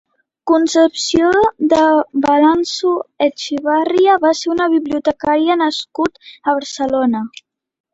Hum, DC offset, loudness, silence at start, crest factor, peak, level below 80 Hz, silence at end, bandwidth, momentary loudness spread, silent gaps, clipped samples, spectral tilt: none; under 0.1%; -15 LUFS; 0.45 s; 14 dB; -2 dBFS; -52 dBFS; 0.65 s; 8 kHz; 8 LU; none; under 0.1%; -3.5 dB/octave